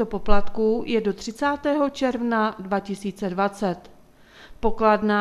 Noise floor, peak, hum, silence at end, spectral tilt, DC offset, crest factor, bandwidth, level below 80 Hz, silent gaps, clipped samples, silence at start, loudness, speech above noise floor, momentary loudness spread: -50 dBFS; -2 dBFS; none; 0 s; -6 dB/octave; under 0.1%; 20 dB; 12 kHz; -38 dBFS; none; under 0.1%; 0 s; -24 LUFS; 28 dB; 8 LU